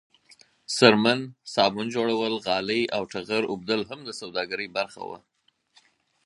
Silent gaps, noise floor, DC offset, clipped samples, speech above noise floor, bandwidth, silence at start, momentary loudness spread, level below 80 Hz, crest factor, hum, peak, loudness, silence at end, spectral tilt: none; -64 dBFS; under 0.1%; under 0.1%; 38 dB; 11.5 kHz; 0.7 s; 15 LU; -68 dBFS; 24 dB; none; -2 dBFS; -25 LUFS; 1.1 s; -4 dB/octave